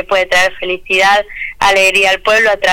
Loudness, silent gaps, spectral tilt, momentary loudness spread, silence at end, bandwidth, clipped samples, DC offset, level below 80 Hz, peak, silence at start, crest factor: -10 LUFS; none; -1.5 dB/octave; 6 LU; 0 s; 18.5 kHz; under 0.1%; under 0.1%; -38 dBFS; -4 dBFS; 0 s; 8 dB